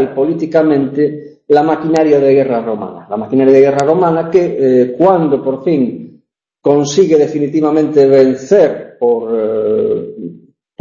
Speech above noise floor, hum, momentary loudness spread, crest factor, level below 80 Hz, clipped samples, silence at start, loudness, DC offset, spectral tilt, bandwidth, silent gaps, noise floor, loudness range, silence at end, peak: 42 dB; none; 10 LU; 12 dB; -54 dBFS; under 0.1%; 0 s; -12 LUFS; under 0.1%; -7 dB/octave; 7.8 kHz; none; -53 dBFS; 2 LU; 0.45 s; 0 dBFS